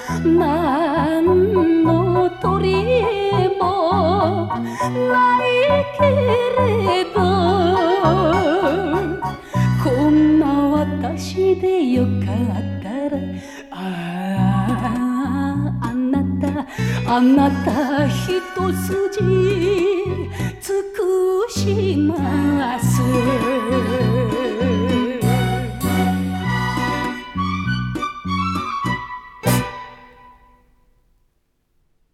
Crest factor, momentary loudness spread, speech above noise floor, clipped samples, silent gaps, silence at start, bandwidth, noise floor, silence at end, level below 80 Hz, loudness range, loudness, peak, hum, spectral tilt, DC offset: 14 dB; 9 LU; 49 dB; under 0.1%; none; 0 s; 15.5 kHz; -65 dBFS; 2.1 s; -42 dBFS; 6 LU; -18 LUFS; -4 dBFS; none; -6.5 dB/octave; under 0.1%